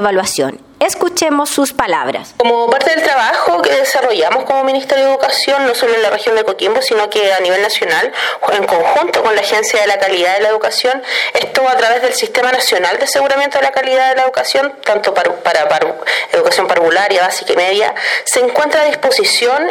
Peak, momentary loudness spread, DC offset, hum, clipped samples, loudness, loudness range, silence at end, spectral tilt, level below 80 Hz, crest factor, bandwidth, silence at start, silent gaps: 0 dBFS; 3 LU; under 0.1%; none; under 0.1%; -12 LUFS; 1 LU; 0 s; -1.5 dB/octave; -58 dBFS; 12 dB; 17.5 kHz; 0 s; none